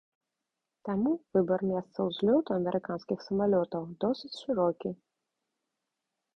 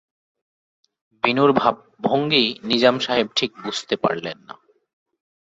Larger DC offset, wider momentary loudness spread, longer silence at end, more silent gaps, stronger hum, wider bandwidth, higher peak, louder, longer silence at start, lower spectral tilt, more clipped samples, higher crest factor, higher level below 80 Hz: neither; about the same, 9 LU vs 11 LU; first, 1.4 s vs 0.95 s; neither; neither; about the same, 8.4 kHz vs 8 kHz; second, -14 dBFS vs -2 dBFS; second, -31 LUFS vs -20 LUFS; second, 0.85 s vs 1.25 s; first, -8.5 dB/octave vs -4.5 dB/octave; neither; about the same, 16 dB vs 20 dB; about the same, -68 dBFS vs -64 dBFS